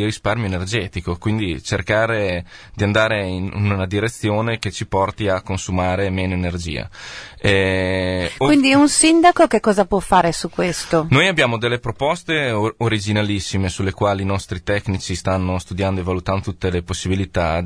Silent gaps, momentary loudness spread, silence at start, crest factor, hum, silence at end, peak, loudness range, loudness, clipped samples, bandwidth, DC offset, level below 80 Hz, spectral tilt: none; 10 LU; 0 s; 16 dB; none; 0 s; -2 dBFS; 7 LU; -19 LUFS; under 0.1%; 11 kHz; under 0.1%; -40 dBFS; -5 dB/octave